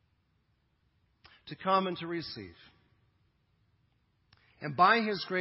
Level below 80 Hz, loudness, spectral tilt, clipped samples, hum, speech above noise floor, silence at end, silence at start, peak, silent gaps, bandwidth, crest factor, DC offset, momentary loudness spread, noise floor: -72 dBFS; -29 LUFS; -8.5 dB/octave; under 0.1%; none; 44 dB; 0 s; 1.45 s; -10 dBFS; none; 5.8 kHz; 24 dB; under 0.1%; 21 LU; -74 dBFS